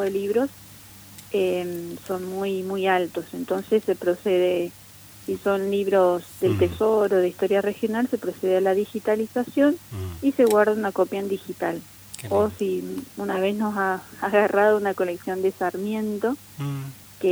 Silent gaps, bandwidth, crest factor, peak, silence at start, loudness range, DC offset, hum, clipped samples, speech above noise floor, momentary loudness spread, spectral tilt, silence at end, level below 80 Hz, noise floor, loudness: none; over 20 kHz; 18 dB; -6 dBFS; 0 s; 4 LU; under 0.1%; none; under 0.1%; 22 dB; 12 LU; -6 dB/octave; 0 s; -58 dBFS; -45 dBFS; -24 LUFS